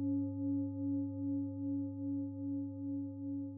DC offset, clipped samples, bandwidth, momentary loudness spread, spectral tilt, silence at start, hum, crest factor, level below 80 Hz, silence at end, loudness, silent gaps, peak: under 0.1%; under 0.1%; 1.3 kHz; 4 LU; -11 dB/octave; 0 s; none; 10 dB; -80 dBFS; 0 s; -39 LUFS; none; -28 dBFS